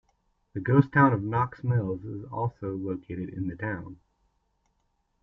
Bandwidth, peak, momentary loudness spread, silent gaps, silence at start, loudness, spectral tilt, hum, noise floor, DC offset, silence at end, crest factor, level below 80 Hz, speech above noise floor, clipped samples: 5.4 kHz; -6 dBFS; 15 LU; none; 0.55 s; -28 LUFS; -11 dB/octave; none; -74 dBFS; under 0.1%; 1.3 s; 22 dB; -58 dBFS; 47 dB; under 0.1%